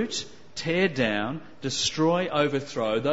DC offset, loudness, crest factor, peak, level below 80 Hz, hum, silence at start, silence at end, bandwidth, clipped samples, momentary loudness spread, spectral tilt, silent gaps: 0.5%; -26 LUFS; 18 dB; -8 dBFS; -58 dBFS; none; 0 s; 0 s; 8 kHz; under 0.1%; 10 LU; -4 dB/octave; none